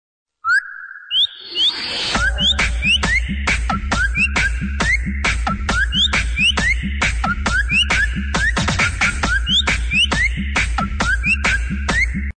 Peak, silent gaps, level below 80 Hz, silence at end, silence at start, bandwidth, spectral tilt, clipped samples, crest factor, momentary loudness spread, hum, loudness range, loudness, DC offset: -8 dBFS; none; -24 dBFS; 0.05 s; 0.45 s; 9.6 kHz; -3 dB/octave; under 0.1%; 10 dB; 5 LU; none; 1 LU; -17 LUFS; under 0.1%